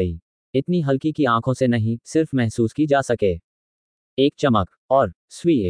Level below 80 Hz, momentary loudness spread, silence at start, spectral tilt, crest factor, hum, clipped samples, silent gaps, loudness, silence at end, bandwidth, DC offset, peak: -48 dBFS; 7 LU; 0 s; -7 dB/octave; 18 dB; none; under 0.1%; 0.22-0.53 s, 3.44-4.17 s, 4.77-4.89 s, 5.16-5.28 s; -21 LUFS; 0 s; 10.5 kHz; under 0.1%; -4 dBFS